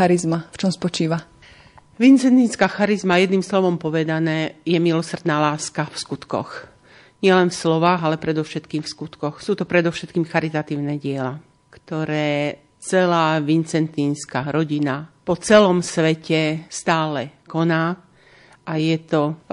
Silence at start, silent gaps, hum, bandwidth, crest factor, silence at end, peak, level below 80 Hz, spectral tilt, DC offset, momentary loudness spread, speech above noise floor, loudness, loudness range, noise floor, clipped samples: 0 s; none; none; 11 kHz; 18 dB; 0.15 s; -2 dBFS; -60 dBFS; -5.5 dB/octave; under 0.1%; 11 LU; 31 dB; -20 LUFS; 5 LU; -50 dBFS; under 0.1%